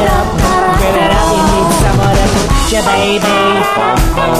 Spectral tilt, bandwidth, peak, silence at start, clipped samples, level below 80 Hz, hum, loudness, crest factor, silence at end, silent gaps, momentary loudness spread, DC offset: -4.5 dB/octave; 15.5 kHz; 0 dBFS; 0 s; under 0.1%; -18 dBFS; none; -11 LUFS; 10 dB; 0 s; none; 2 LU; under 0.1%